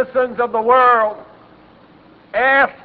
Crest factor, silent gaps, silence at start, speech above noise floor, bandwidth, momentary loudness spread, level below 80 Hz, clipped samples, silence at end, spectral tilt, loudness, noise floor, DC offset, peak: 16 dB; none; 0 s; 31 dB; 4.9 kHz; 11 LU; -56 dBFS; under 0.1%; 0.1 s; -7.5 dB/octave; -15 LUFS; -46 dBFS; under 0.1%; -2 dBFS